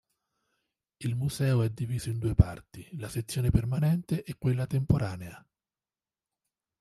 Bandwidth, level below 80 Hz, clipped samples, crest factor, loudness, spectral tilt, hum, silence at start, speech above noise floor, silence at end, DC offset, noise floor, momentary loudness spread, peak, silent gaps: 13.5 kHz; -44 dBFS; under 0.1%; 24 dB; -29 LUFS; -7 dB/octave; none; 1 s; over 62 dB; 1.4 s; under 0.1%; under -90 dBFS; 13 LU; -6 dBFS; none